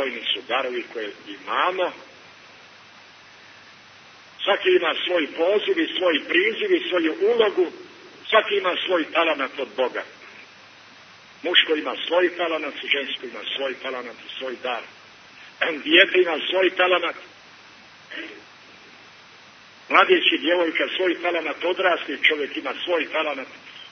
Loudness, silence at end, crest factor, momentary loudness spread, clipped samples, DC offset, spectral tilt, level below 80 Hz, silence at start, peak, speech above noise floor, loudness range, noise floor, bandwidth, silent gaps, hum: -21 LUFS; 0.05 s; 22 dB; 16 LU; under 0.1%; under 0.1%; -3.5 dB/octave; -78 dBFS; 0 s; -2 dBFS; 26 dB; 7 LU; -48 dBFS; 6.4 kHz; none; none